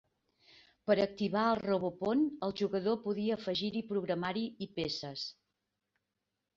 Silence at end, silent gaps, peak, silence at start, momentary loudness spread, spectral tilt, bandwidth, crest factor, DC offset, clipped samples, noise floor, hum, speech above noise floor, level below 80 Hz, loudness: 1.25 s; none; -16 dBFS; 0.85 s; 8 LU; -6.5 dB/octave; 7.4 kHz; 20 dB; under 0.1%; under 0.1%; -87 dBFS; none; 53 dB; -70 dBFS; -34 LUFS